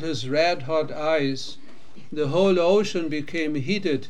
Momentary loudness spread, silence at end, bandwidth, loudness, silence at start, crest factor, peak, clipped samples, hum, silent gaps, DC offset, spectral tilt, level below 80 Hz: 9 LU; 0 s; 10.5 kHz; -23 LUFS; 0 s; 16 dB; -8 dBFS; under 0.1%; none; none; 3%; -5.5 dB/octave; -66 dBFS